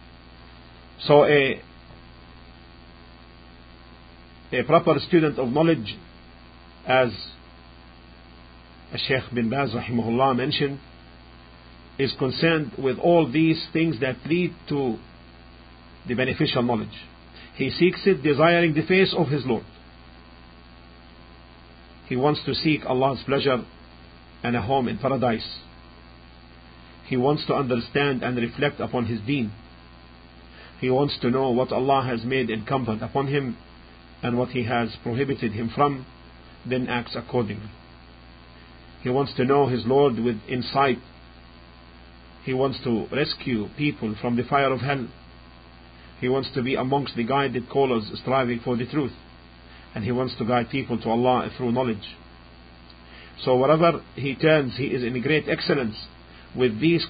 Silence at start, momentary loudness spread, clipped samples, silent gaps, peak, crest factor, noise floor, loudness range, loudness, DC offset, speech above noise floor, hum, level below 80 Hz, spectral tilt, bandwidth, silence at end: 0.05 s; 13 LU; under 0.1%; none; -2 dBFS; 22 dB; -47 dBFS; 5 LU; -23 LUFS; under 0.1%; 25 dB; 60 Hz at -50 dBFS; -50 dBFS; -11 dB/octave; 5 kHz; 0 s